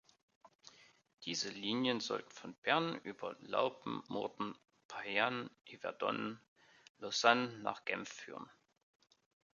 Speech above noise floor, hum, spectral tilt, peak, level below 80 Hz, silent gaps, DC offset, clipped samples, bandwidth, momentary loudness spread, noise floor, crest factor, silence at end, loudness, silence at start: 25 dB; none; -1.5 dB/octave; -12 dBFS; -84 dBFS; 2.58-2.62 s, 4.85-4.89 s, 6.48-6.56 s, 6.90-6.95 s; under 0.1%; under 0.1%; 7.4 kHz; 17 LU; -63 dBFS; 28 dB; 1.1 s; -38 LUFS; 0.45 s